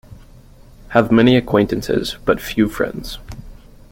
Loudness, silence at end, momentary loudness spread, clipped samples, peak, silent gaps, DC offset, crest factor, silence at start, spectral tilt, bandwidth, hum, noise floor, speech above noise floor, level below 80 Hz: -17 LUFS; 0.4 s; 19 LU; under 0.1%; 0 dBFS; none; under 0.1%; 18 dB; 0.1 s; -6.5 dB/octave; 16.5 kHz; none; -43 dBFS; 27 dB; -38 dBFS